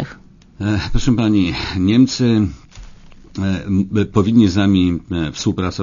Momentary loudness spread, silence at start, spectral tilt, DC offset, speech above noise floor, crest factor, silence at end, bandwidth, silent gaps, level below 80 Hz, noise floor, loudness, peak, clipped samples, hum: 9 LU; 0 s; -6.5 dB/octave; under 0.1%; 26 dB; 16 dB; 0 s; 7.4 kHz; none; -32 dBFS; -41 dBFS; -17 LUFS; -2 dBFS; under 0.1%; none